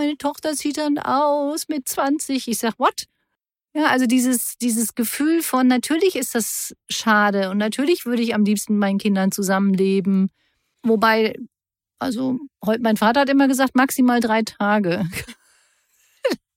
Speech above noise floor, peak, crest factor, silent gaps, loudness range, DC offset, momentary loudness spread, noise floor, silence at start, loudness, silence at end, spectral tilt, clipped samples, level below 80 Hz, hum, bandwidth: 60 dB; -4 dBFS; 16 dB; none; 3 LU; under 0.1%; 9 LU; -80 dBFS; 0 s; -20 LUFS; 0.2 s; -4.5 dB/octave; under 0.1%; -60 dBFS; none; 16.5 kHz